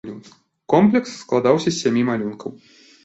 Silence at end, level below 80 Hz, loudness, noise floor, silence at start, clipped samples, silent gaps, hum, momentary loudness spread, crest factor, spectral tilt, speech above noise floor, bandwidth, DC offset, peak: 0.5 s; -60 dBFS; -19 LUFS; -50 dBFS; 0.05 s; under 0.1%; none; none; 19 LU; 18 dB; -6 dB/octave; 31 dB; 8.2 kHz; under 0.1%; -2 dBFS